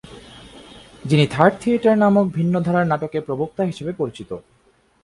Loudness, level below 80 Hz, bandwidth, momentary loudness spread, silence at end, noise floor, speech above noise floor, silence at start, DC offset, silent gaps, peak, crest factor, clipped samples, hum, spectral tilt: -19 LUFS; -54 dBFS; 11.5 kHz; 19 LU; 0.65 s; -59 dBFS; 40 dB; 0.1 s; under 0.1%; none; 0 dBFS; 20 dB; under 0.1%; none; -7.5 dB/octave